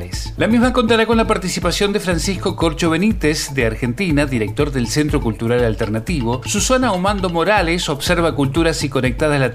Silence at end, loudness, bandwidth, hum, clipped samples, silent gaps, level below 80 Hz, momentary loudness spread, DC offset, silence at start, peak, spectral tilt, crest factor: 0 s; -17 LUFS; 16 kHz; none; under 0.1%; none; -30 dBFS; 5 LU; under 0.1%; 0 s; 0 dBFS; -5 dB/octave; 16 dB